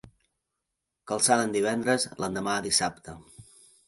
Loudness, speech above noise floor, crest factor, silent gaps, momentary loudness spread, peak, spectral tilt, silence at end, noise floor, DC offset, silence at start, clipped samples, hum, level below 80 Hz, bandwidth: -26 LUFS; 57 dB; 22 dB; none; 19 LU; -6 dBFS; -2.5 dB/octave; 0.45 s; -84 dBFS; under 0.1%; 1.05 s; under 0.1%; none; -62 dBFS; 12 kHz